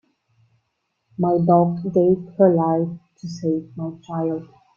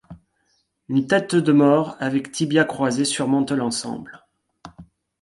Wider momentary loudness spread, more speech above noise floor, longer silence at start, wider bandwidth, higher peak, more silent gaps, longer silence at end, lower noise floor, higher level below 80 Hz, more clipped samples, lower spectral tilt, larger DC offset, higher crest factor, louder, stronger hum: first, 15 LU vs 9 LU; first, 54 dB vs 48 dB; first, 1.2 s vs 0.1 s; second, 7 kHz vs 11.5 kHz; about the same, -2 dBFS vs -4 dBFS; neither; about the same, 0.35 s vs 0.4 s; first, -74 dBFS vs -68 dBFS; about the same, -62 dBFS vs -60 dBFS; neither; first, -9.5 dB/octave vs -5 dB/octave; neither; about the same, 20 dB vs 18 dB; about the same, -20 LUFS vs -20 LUFS; neither